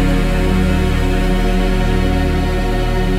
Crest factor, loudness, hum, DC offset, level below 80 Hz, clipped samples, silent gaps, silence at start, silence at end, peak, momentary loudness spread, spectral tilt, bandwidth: 12 dB; -17 LUFS; none; under 0.1%; -16 dBFS; under 0.1%; none; 0 s; 0 s; -2 dBFS; 2 LU; -6.5 dB/octave; 14.5 kHz